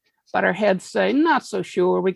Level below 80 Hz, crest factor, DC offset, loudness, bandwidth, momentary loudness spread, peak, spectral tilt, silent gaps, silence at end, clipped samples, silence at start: -66 dBFS; 16 dB; under 0.1%; -21 LUFS; 12 kHz; 5 LU; -4 dBFS; -5.5 dB/octave; none; 0 s; under 0.1%; 0.35 s